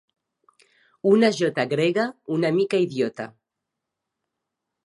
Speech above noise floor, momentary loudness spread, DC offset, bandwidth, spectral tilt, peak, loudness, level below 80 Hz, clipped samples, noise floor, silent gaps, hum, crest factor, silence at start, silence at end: 62 dB; 9 LU; under 0.1%; 11.5 kHz; -6 dB/octave; -4 dBFS; -22 LUFS; -76 dBFS; under 0.1%; -84 dBFS; none; none; 20 dB; 1.05 s; 1.6 s